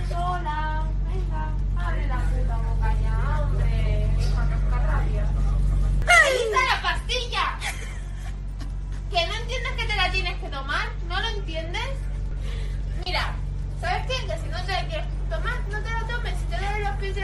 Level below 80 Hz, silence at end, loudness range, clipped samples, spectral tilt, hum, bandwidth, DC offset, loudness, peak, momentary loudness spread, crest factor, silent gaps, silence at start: -26 dBFS; 0 s; 7 LU; under 0.1%; -4.5 dB/octave; none; 12 kHz; under 0.1%; -26 LUFS; -4 dBFS; 9 LU; 20 dB; none; 0 s